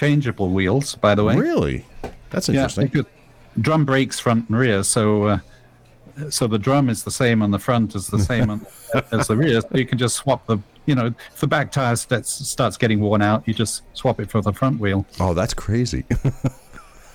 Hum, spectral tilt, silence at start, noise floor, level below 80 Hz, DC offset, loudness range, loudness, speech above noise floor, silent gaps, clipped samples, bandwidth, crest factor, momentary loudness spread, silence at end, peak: none; -5.5 dB/octave; 0 s; -49 dBFS; -40 dBFS; under 0.1%; 1 LU; -20 LUFS; 30 dB; none; under 0.1%; 18.5 kHz; 18 dB; 7 LU; 0.35 s; -2 dBFS